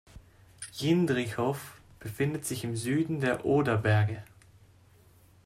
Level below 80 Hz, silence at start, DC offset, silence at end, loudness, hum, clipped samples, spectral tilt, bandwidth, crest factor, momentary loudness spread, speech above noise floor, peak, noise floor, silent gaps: -60 dBFS; 0.15 s; under 0.1%; 1.2 s; -29 LUFS; none; under 0.1%; -6 dB/octave; 15 kHz; 16 dB; 17 LU; 31 dB; -14 dBFS; -59 dBFS; none